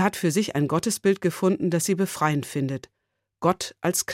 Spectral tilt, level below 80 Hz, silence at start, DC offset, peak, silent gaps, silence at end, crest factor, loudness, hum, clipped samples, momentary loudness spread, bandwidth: -5 dB/octave; -64 dBFS; 0 s; under 0.1%; -6 dBFS; none; 0 s; 18 dB; -24 LUFS; none; under 0.1%; 5 LU; 16.5 kHz